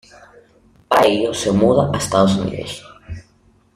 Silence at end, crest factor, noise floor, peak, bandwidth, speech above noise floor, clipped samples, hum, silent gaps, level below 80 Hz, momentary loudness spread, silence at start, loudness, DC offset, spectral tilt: 0.55 s; 18 dB; -55 dBFS; -2 dBFS; 16 kHz; 38 dB; under 0.1%; none; none; -46 dBFS; 21 LU; 0.9 s; -16 LUFS; under 0.1%; -5.5 dB/octave